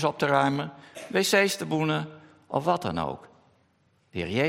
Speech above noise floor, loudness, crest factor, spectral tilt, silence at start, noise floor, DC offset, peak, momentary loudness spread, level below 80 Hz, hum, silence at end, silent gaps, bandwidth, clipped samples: 41 dB; -26 LUFS; 22 dB; -4.5 dB/octave; 0 s; -67 dBFS; under 0.1%; -6 dBFS; 16 LU; -64 dBFS; none; 0 s; none; 16 kHz; under 0.1%